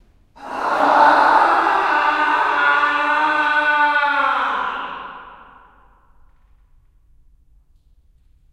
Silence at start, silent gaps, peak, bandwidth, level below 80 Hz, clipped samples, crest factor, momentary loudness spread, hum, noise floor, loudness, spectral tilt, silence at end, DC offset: 0.4 s; none; -2 dBFS; 11.5 kHz; -54 dBFS; under 0.1%; 18 dB; 15 LU; none; -54 dBFS; -16 LUFS; -3 dB/octave; 3.15 s; under 0.1%